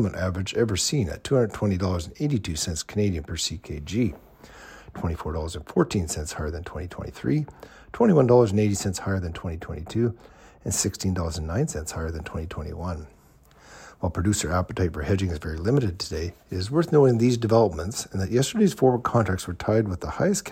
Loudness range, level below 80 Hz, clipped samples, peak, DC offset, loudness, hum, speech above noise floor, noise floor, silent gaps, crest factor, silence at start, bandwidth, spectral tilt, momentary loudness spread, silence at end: 7 LU; -42 dBFS; under 0.1%; -6 dBFS; under 0.1%; -25 LUFS; none; 30 dB; -54 dBFS; none; 20 dB; 0 s; 16 kHz; -5.5 dB/octave; 13 LU; 0 s